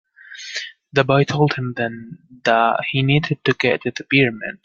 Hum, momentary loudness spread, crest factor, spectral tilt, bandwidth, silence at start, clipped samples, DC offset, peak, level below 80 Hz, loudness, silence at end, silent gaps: none; 13 LU; 18 dB; -6 dB/octave; 7.4 kHz; 0.3 s; under 0.1%; under 0.1%; -2 dBFS; -56 dBFS; -19 LUFS; 0.15 s; none